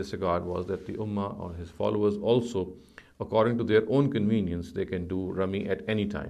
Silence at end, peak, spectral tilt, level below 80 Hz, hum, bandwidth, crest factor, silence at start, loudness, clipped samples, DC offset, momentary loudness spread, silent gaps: 0 s; -10 dBFS; -7.5 dB/octave; -48 dBFS; none; 11 kHz; 18 dB; 0 s; -28 LUFS; under 0.1%; under 0.1%; 10 LU; none